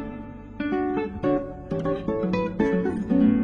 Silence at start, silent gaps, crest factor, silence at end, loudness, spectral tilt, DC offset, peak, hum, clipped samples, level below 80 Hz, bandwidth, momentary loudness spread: 0 s; none; 14 dB; 0 s; -25 LUFS; -9 dB/octave; under 0.1%; -10 dBFS; none; under 0.1%; -44 dBFS; 7 kHz; 10 LU